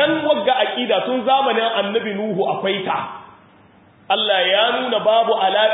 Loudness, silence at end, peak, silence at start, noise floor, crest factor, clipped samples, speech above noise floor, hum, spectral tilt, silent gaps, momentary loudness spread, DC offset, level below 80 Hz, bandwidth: -18 LUFS; 0 s; -4 dBFS; 0 s; -50 dBFS; 14 dB; under 0.1%; 32 dB; none; -9 dB/octave; none; 7 LU; under 0.1%; -68 dBFS; 4 kHz